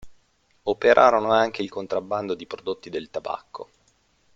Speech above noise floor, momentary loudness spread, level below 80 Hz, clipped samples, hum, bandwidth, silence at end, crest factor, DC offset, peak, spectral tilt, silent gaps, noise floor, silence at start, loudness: 41 dB; 16 LU; -60 dBFS; under 0.1%; none; 7.6 kHz; 0.75 s; 22 dB; under 0.1%; -2 dBFS; -5 dB/octave; none; -64 dBFS; 0.05 s; -23 LUFS